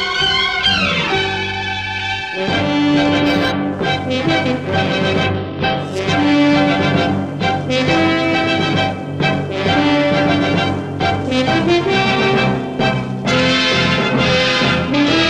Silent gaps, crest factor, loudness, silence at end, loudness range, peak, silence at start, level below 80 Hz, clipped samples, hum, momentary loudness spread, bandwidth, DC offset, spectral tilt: none; 14 dB; -15 LUFS; 0 s; 2 LU; -2 dBFS; 0 s; -40 dBFS; under 0.1%; none; 6 LU; 10 kHz; under 0.1%; -5.5 dB/octave